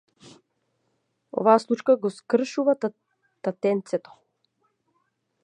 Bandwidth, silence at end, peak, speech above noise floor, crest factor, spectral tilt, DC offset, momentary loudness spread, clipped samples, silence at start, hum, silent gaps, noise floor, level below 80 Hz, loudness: 10.5 kHz; 1.45 s; -4 dBFS; 51 dB; 22 dB; -6 dB/octave; under 0.1%; 12 LU; under 0.1%; 1.35 s; none; none; -74 dBFS; -82 dBFS; -24 LUFS